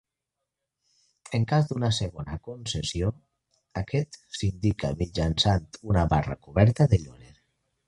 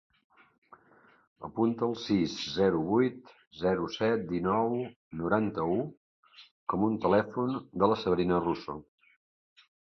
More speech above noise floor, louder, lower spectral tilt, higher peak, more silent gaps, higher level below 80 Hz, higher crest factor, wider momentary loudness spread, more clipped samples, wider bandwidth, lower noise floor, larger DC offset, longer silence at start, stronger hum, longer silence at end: first, 60 dB vs 33 dB; first, -27 LUFS vs -30 LUFS; about the same, -6 dB/octave vs -7 dB/octave; first, -6 dBFS vs -10 dBFS; second, none vs 3.47-3.51 s, 4.96-5.11 s, 5.97-6.23 s, 6.51-6.67 s; first, -40 dBFS vs -60 dBFS; about the same, 22 dB vs 22 dB; first, 13 LU vs 10 LU; neither; first, 11 kHz vs 7.2 kHz; first, -85 dBFS vs -62 dBFS; neither; about the same, 1.3 s vs 1.4 s; neither; second, 0.75 s vs 1.05 s